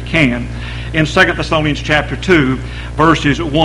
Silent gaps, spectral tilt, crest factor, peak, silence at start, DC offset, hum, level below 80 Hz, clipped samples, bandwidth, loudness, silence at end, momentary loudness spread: none; -5.5 dB/octave; 14 dB; 0 dBFS; 0 s; under 0.1%; none; -26 dBFS; 0.1%; 11.5 kHz; -14 LUFS; 0 s; 10 LU